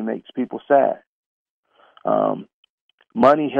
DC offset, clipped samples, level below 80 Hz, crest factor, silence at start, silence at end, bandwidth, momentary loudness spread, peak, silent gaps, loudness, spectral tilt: under 0.1%; under 0.1%; -66 dBFS; 20 dB; 0 s; 0 s; 7.2 kHz; 16 LU; -2 dBFS; 1.07-1.63 s, 2.53-2.63 s, 2.69-2.98 s; -20 LUFS; -8 dB/octave